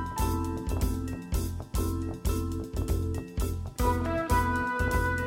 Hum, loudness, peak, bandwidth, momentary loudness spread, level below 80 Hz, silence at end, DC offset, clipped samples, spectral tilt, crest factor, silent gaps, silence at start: none; -31 LUFS; -12 dBFS; 17 kHz; 7 LU; -34 dBFS; 0 s; under 0.1%; under 0.1%; -6 dB/octave; 16 dB; none; 0 s